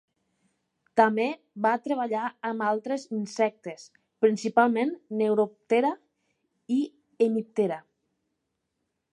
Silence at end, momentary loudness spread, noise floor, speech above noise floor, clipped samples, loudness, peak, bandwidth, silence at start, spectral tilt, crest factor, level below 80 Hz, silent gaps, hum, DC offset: 1.35 s; 9 LU; -80 dBFS; 54 dB; under 0.1%; -27 LUFS; -6 dBFS; 11 kHz; 0.95 s; -6 dB/octave; 22 dB; -84 dBFS; none; none; under 0.1%